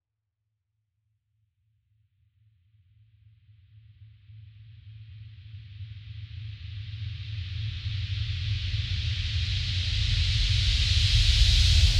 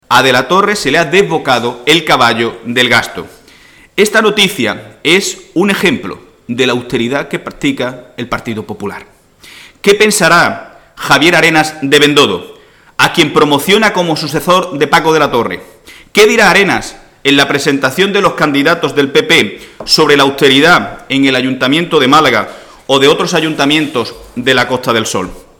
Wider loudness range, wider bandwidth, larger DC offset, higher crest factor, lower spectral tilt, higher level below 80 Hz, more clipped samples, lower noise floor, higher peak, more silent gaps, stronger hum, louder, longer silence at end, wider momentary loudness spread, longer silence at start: first, 23 LU vs 5 LU; second, 12 kHz vs 19 kHz; neither; first, 20 dB vs 12 dB; about the same, -3 dB/octave vs -3.5 dB/octave; first, -32 dBFS vs -44 dBFS; second, under 0.1% vs 0.2%; first, -83 dBFS vs -41 dBFS; second, -8 dBFS vs 0 dBFS; neither; neither; second, -26 LUFS vs -10 LUFS; second, 0 s vs 0.2 s; first, 25 LU vs 13 LU; first, 4 s vs 0.1 s